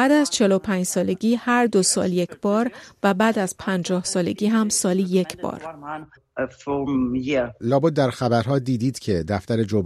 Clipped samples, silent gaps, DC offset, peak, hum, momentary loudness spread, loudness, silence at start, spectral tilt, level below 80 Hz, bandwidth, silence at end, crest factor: under 0.1%; none; under 0.1%; -6 dBFS; none; 11 LU; -22 LUFS; 0 s; -5 dB/octave; -54 dBFS; 14.5 kHz; 0 s; 16 dB